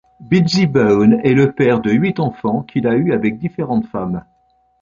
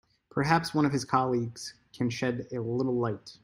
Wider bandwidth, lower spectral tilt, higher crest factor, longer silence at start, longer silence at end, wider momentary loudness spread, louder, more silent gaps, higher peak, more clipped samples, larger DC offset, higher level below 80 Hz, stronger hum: second, 7.4 kHz vs 16 kHz; first, -7.5 dB/octave vs -6 dB/octave; second, 14 dB vs 22 dB; second, 0.2 s vs 0.35 s; first, 0.6 s vs 0.1 s; about the same, 10 LU vs 10 LU; first, -15 LUFS vs -29 LUFS; neither; first, -2 dBFS vs -8 dBFS; neither; neither; first, -48 dBFS vs -64 dBFS; neither